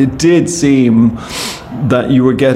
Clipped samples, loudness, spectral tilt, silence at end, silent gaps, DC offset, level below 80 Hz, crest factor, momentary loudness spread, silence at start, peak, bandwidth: under 0.1%; -12 LUFS; -6 dB/octave; 0 s; none; under 0.1%; -38 dBFS; 10 dB; 10 LU; 0 s; 0 dBFS; 13.5 kHz